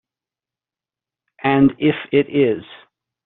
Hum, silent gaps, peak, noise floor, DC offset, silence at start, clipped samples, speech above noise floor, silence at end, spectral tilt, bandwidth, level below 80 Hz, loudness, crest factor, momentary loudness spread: none; none; -2 dBFS; under -90 dBFS; under 0.1%; 1.45 s; under 0.1%; over 74 dB; 0.5 s; -5.5 dB/octave; 4.1 kHz; -56 dBFS; -18 LUFS; 18 dB; 7 LU